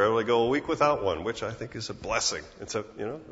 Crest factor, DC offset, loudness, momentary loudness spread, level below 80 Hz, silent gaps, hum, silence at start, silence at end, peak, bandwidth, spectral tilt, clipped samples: 20 dB; under 0.1%; -28 LUFS; 12 LU; -54 dBFS; none; none; 0 s; 0 s; -8 dBFS; 8 kHz; -3.5 dB/octave; under 0.1%